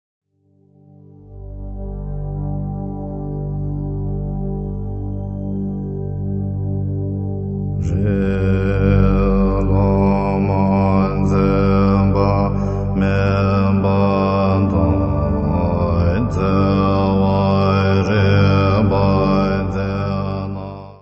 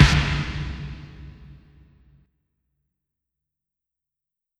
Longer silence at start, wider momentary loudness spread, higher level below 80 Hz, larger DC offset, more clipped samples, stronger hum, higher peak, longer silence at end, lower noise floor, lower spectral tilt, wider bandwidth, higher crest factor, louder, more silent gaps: first, 1.25 s vs 0 s; second, 11 LU vs 24 LU; about the same, -28 dBFS vs -32 dBFS; neither; neither; first, 50 Hz at -40 dBFS vs none; about the same, -2 dBFS vs 0 dBFS; second, 0.05 s vs 3.05 s; second, -56 dBFS vs -87 dBFS; first, -9.5 dB/octave vs -5 dB/octave; second, 6.6 kHz vs 11.5 kHz; second, 16 dB vs 26 dB; first, -18 LUFS vs -24 LUFS; neither